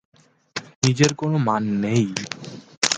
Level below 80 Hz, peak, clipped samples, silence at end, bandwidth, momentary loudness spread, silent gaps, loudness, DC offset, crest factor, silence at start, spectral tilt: -58 dBFS; 0 dBFS; under 0.1%; 0 s; 9.6 kHz; 15 LU; 0.76-0.82 s, 2.77-2.82 s; -21 LUFS; under 0.1%; 22 dB; 0.55 s; -4.5 dB/octave